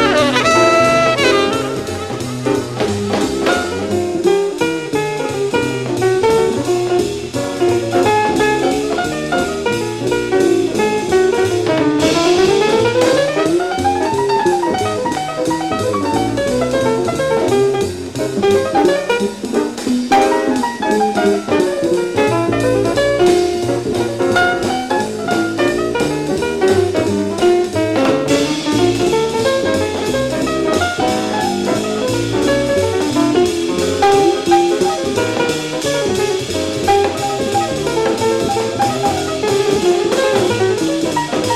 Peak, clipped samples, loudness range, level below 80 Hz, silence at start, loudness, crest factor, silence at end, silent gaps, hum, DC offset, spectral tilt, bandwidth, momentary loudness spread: 0 dBFS; under 0.1%; 3 LU; -44 dBFS; 0 s; -15 LUFS; 14 dB; 0 s; none; none; 0.2%; -4.5 dB/octave; 14.5 kHz; 6 LU